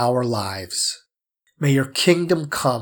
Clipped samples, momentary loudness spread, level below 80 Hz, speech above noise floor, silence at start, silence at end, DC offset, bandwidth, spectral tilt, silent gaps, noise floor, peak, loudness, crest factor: under 0.1%; 8 LU; -62 dBFS; 51 dB; 0 s; 0 s; under 0.1%; over 20 kHz; -4.5 dB/octave; none; -71 dBFS; -4 dBFS; -21 LUFS; 18 dB